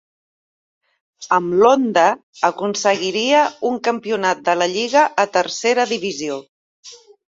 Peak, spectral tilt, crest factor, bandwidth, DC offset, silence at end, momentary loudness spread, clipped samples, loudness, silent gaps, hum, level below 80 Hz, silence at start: 0 dBFS; -3 dB/octave; 18 dB; 7.8 kHz; under 0.1%; 0.35 s; 7 LU; under 0.1%; -17 LUFS; 2.23-2.33 s, 6.49-6.83 s; none; -66 dBFS; 1.2 s